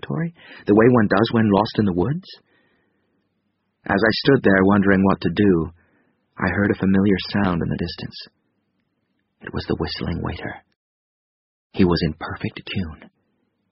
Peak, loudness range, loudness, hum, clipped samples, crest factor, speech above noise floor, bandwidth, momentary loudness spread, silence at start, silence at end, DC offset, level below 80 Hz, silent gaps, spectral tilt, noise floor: -2 dBFS; 11 LU; -20 LUFS; none; under 0.1%; 20 dB; 52 dB; 5.8 kHz; 17 LU; 0.05 s; 0.65 s; under 0.1%; -44 dBFS; 10.76-11.70 s; -5.5 dB/octave; -71 dBFS